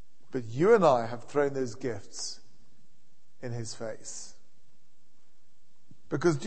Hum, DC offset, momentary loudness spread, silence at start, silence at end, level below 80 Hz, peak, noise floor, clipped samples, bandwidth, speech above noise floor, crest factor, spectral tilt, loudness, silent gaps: none; 1%; 20 LU; 0.35 s; 0 s; -66 dBFS; -8 dBFS; -70 dBFS; under 0.1%; 8.8 kHz; 42 dB; 22 dB; -5.5 dB/octave; -29 LUFS; none